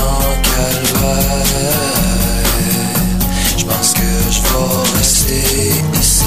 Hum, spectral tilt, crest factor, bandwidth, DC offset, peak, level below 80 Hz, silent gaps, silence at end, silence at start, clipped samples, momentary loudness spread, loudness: none; -3.5 dB/octave; 12 dB; 15.5 kHz; 2%; 0 dBFS; -20 dBFS; none; 0 s; 0 s; under 0.1%; 3 LU; -13 LUFS